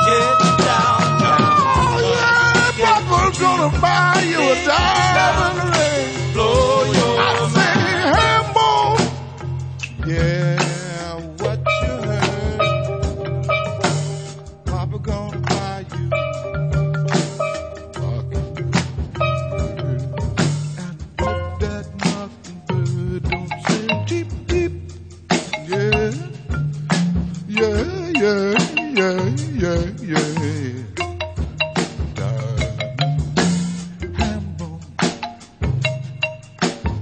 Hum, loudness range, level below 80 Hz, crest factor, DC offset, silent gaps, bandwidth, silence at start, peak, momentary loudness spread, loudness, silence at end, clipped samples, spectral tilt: none; 8 LU; -34 dBFS; 18 dB; under 0.1%; none; 9.4 kHz; 0 s; 0 dBFS; 12 LU; -19 LUFS; 0 s; under 0.1%; -5 dB/octave